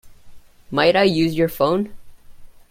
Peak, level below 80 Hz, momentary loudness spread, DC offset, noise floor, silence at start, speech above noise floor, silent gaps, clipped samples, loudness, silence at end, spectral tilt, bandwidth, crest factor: -2 dBFS; -48 dBFS; 10 LU; under 0.1%; -40 dBFS; 0.05 s; 23 dB; none; under 0.1%; -18 LUFS; 0.2 s; -6 dB/octave; 16.5 kHz; 18 dB